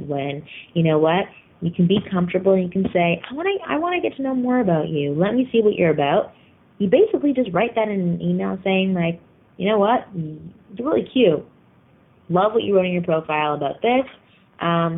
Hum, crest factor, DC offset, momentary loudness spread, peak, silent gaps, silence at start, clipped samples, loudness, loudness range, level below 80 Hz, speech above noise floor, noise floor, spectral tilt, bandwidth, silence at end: none; 16 dB; under 0.1%; 10 LU; -4 dBFS; none; 0 s; under 0.1%; -20 LUFS; 2 LU; -56 dBFS; 34 dB; -54 dBFS; -11 dB/octave; 3.9 kHz; 0 s